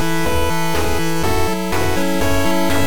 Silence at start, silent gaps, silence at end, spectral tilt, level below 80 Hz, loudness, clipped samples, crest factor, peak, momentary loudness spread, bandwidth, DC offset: 0 s; none; 0 s; -4.5 dB/octave; -30 dBFS; -19 LUFS; under 0.1%; 12 dB; -6 dBFS; 2 LU; 17.5 kHz; 10%